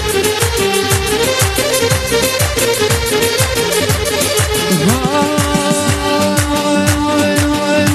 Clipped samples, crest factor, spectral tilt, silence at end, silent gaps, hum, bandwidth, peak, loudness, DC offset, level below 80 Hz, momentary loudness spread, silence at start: under 0.1%; 14 dB; -3.5 dB/octave; 0 s; none; none; 13.5 kHz; 0 dBFS; -13 LUFS; under 0.1%; -28 dBFS; 1 LU; 0 s